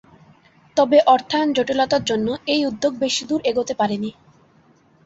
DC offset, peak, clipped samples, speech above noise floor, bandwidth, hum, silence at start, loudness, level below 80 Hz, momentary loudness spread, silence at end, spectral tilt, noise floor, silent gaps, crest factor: under 0.1%; -2 dBFS; under 0.1%; 36 dB; 8 kHz; none; 0.75 s; -19 LUFS; -58 dBFS; 8 LU; 0.95 s; -4 dB/octave; -55 dBFS; none; 18 dB